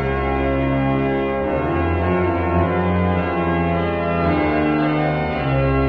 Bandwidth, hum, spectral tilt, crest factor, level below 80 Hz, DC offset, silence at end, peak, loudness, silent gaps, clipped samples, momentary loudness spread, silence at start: 5.4 kHz; none; -10 dB/octave; 12 dB; -32 dBFS; 0.4%; 0 s; -6 dBFS; -19 LUFS; none; under 0.1%; 2 LU; 0 s